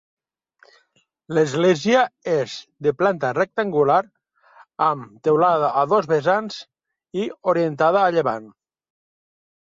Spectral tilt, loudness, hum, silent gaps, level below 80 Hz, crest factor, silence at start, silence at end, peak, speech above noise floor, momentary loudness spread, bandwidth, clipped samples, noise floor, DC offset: -6 dB/octave; -20 LUFS; none; none; -66 dBFS; 16 dB; 1.3 s; 1.25 s; -4 dBFS; 45 dB; 11 LU; 7.8 kHz; under 0.1%; -65 dBFS; under 0.1%